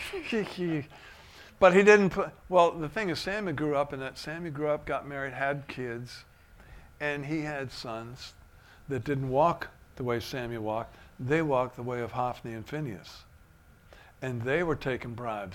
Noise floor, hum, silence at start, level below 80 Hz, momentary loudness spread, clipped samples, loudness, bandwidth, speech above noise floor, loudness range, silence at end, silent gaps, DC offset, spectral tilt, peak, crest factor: -57 dBFS; none; 0 s; -56 dBFS; 16 LU; under 0.1%; -29 LUFS; 16 kHz; 28 dB; 10 LU; 0 s; none; under 0.1%; -6 dB/octave; -6 dBFS; 24 dB